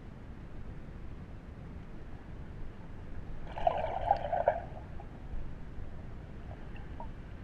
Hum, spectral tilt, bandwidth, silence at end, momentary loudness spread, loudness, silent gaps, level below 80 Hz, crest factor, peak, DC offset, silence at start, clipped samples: none; -8 dB/octave; 6.6 kHz; 0 s; 16 LU; -40 LUFS; none; -44 dBFS; 26 dB; -12 dBFS; under 0.1%; 0 s; under 0.1%